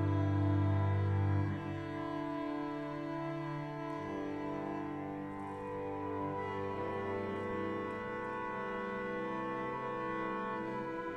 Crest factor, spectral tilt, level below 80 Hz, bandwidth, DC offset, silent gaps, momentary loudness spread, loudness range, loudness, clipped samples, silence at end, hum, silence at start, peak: 14 dB; -8.5 dB/octave; -64 dBFS; 6.2 kHz; under 0.1%; none; 8 LU; 5 LU; -38 LUFS; under 0.1%; 0 s; none; 0 s; -22 dBFS